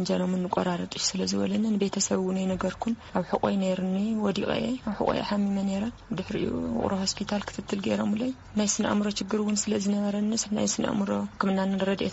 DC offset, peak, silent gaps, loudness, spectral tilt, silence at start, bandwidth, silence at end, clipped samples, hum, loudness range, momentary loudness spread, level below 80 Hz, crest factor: under 0.1%; -10 dBFS; none; -28 LUFS; -5 dB/octave; 0 s; 8 kHz; 0 s; under 0.1%; none; 2 LU; 5 LU; -54 dBFS; 18 dB